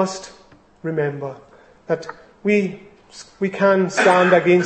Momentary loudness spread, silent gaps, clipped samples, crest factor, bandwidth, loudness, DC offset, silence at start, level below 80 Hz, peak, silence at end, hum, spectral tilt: 24 LU; none; under 0.1%; 18 dB; 8.8 kHz; -19 LUFS; under 0.1%; 0 s; -62 dBFS; -2 dBFS; 0 s; none; -5.5 dB/octave